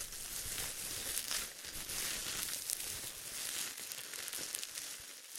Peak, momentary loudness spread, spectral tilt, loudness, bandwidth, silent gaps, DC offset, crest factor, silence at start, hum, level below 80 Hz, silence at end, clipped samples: -12 dBFS; 6 LU; 0.5 dB/octave; -39 LUFS; 17 kHz; none; under 0.1%; 32 dB; 0 s; none; -62 dBFS; 0 s; under 0.1%